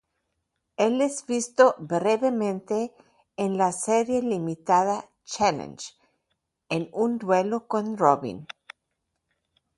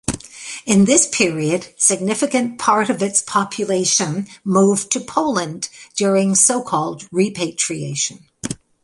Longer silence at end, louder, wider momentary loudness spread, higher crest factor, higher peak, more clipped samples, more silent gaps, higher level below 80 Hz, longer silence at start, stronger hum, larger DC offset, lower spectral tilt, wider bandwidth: first, 1.35 s vs 0.3 s; second, -25 LUFS vs -17 LUFS; first, 16 LU vs 13 LU; about the same, 22 dB vs 18 dB; second, -4 dBFS vs 0 dBFS; neither; neither; second, -66 dBFS vs -52 dBFS; first, 0.8 s vs 0.1 s; neither; neither; first, -5 dB/octave vs -3.5 dB/octave; about the same, 11.5 kHz vs 11.5 kHz